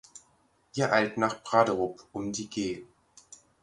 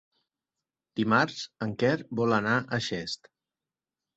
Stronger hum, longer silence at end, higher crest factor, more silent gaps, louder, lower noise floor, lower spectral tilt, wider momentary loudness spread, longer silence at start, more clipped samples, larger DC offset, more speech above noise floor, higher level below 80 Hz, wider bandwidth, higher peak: neither; second, 0.3 s vs 1 s; about the same, 22 dB vs 22 dB; neither; about the same, -29 LUFS vs -28 LUFS; second, -67 dBFS vs under -90 dBFS; about the same, -4.5 dB/octave vs -5.5 dB/octave; about the same, 12 LU vs 11 LU; second, 0.15 s vs 0.95 s; neither; neither; second, 39 dB vs over 62 dB; about the same, -64 dBFS vs -66 dBFS; first, 11.5 kHz vs 8.2 kHz; about the same, -8 dBFS vs -8 dBFS